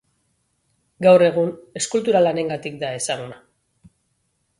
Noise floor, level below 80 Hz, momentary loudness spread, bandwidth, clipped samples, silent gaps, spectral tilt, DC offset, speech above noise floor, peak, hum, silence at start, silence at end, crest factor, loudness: -70 dBFS; -64 dBFS; 13 LU; 11.5 kHz; under 0.1%; none; -4.5 dB/octave; under 0.1%; 51 dB; -2 dBFS; none; 1 s; 1.25 s; 20 dB; -19 LUFS